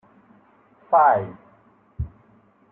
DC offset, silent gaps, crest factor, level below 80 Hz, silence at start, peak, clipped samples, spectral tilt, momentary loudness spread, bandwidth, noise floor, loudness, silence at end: under 0.1%; none; 20 dB; -46 dBFS; 0.9 s; -4 dBFS; under 0.1%; -11 dB/octave; 18 LU; 3.8 kHz; -57 dBFS; -19 LUFS; 0.65 s